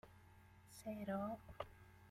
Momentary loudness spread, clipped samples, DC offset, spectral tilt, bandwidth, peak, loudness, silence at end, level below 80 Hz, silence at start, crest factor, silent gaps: 21 LU; under 0.1%; under 0.1%; -6.5 dB/octave; 16 kHz; -32 dBFS; -49 LUFS; 0 s; -70 dBFS; 0.05 s; 18 dB; none